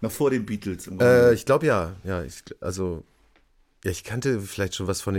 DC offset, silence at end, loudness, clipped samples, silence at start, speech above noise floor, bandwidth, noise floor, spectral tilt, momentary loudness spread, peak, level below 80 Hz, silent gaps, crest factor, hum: under 0.1%; 0 s; -24 LUFS; under 0.1%; 0 s; 38 dB; 17 kHz; -61 dBFS; -5.5 dB/octave; 15 LU; -8 dBFS; -50 dBFS; none; 16 dB; none